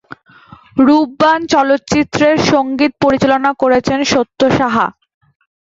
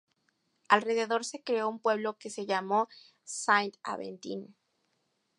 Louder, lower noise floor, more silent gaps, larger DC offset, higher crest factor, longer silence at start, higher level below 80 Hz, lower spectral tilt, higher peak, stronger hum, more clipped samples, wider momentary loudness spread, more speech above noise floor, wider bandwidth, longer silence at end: first, -13 LUFS vs -31 LUFS; second, -41 dBFS vs -77 dBFS; neither; neither; second, 12 dB vs 26 dB; about the same, 0.75 s vs 0.7 s; first, -44 dBFS vs -86 dBFS; first, -5 dB/octave vs -3 dB/octave; first, 0 dBFS vs -6 dBFS; neither; neither; second, 4 LU vs 14 LU; second, 29 dB vs 46 dB; second, 7.8 kHz vs 11.5 kHz; second, 0.75 s vs 0.9 s